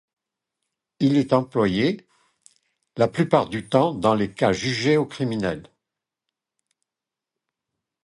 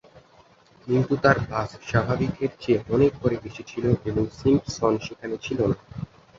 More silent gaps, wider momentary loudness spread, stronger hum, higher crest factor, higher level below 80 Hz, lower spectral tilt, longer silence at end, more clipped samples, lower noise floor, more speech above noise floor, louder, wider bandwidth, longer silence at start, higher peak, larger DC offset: neither; second, 7 LU vs 12 LU; neither; about the same, 22 dB vs 22 dB; second, -56 dBFS vs -46 dBFS; about the same, -6.5 dB/octave vs -7 dB/octave; first, 2.4 s vs 0.35 s; neither; first, -88 dBFS vs -55 dBFS; first, 67 dB vs 32 dB; about the same, -22 LUFS vs -24 LUFS; first, 11.5 kHz vs 7.6 kHz; first, 1 s vs 0.15 s; about the same, -2 dBFS vs -2 dBFS; neither